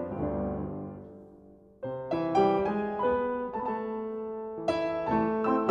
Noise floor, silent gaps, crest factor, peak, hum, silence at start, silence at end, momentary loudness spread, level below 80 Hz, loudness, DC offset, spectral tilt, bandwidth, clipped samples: -54 dBFS; none; 20 dB; -10 dBFS; none; 0 s; 0 s; 14 LU; -54 dBFS; -30 LUFS; under 0.1%; -8 dB/octave; 9.4 kHz; under 0.1%